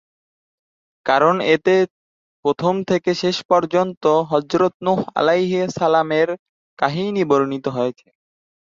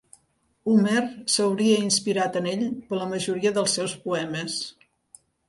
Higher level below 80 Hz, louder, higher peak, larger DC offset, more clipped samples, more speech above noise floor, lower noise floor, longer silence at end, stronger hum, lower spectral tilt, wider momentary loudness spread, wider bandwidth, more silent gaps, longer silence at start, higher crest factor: first, -62 dBFS vs -68 dBFS; first, -19 LUFS vs -24 LUFS; first, -2 dBFS vs -8 dBFS; neither; neither; first, over 72 dB vs 44 dB; first, under -90 dBFS vs -68 dBFS; about the same, 0.75 s vs 0.8 s; neither; first, -6 dB/octave vs -4 dB/octave; about the same, 7 LU vs 9 LU; second, 7.6 kHz vs 11.5 kHz; first, 1.90-2.43 s, 3.45-3.49 s, 3.97-4.01 s, 4.74-4.80 s, 6.39-6.77 s vs none; first, 1.05 s vs 0.65 s; about the same, 18 dB vs 16 dB